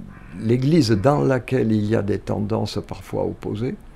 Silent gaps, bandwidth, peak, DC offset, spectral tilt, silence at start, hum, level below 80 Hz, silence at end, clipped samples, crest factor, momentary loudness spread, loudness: none; 13.5 kHz; -2 dBFS; under 0.1%; -7.5 dB/octave; 0 s; none; -44 dBFS; 0 s; under 0.1%; 18 dB; 11 LU; -21 LUFS